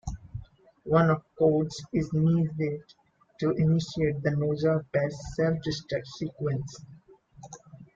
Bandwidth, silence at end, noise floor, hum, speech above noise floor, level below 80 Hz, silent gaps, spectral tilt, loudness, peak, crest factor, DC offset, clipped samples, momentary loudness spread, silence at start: 7.6 kHz; 0.1 s; -54 dBFS; none; 27 dB; -52 dBFS; none; -7.5 dB/octave; -28 LUFS; -10 dBFS; 20 dB; under 0.1%; under 0.1%; 20 LU; 0.05 s